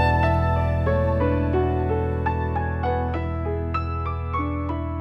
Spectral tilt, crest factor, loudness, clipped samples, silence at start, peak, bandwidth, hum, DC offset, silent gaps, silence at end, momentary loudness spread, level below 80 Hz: -9.5 dB/octave; 14 dB; -24 LUFS; under 0.1%; 0 s; -8 dBFS; 5.6 kHz; none; under 0.1%; none; 0 s; 6 LU; -30 dBFS